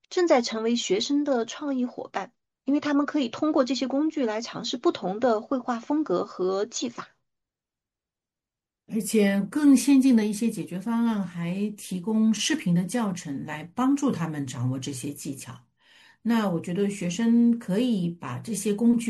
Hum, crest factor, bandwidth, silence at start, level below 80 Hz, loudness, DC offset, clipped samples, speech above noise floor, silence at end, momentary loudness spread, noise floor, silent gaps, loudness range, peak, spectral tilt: none; 18 dB; 12.5 kHz; 0.1 s; -70 dBFS; -26 LUFS; under 0.1%; under 0.1%; over 65 dB; 0 s; 12 LU; under -90 dBFS; none; 6 LU; -8 dBFS; -5.5 dB/octave